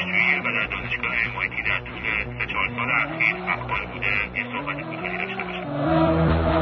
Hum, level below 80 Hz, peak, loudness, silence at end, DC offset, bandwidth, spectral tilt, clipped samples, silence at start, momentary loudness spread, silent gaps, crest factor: none; -38 dBFS; -6 dBFS; -23 LUFS; 0 s; under 0.1%; 6.2 kHz; -8 dB/octave; under 0.1%; 0 s; 8 LU; none; 18 dB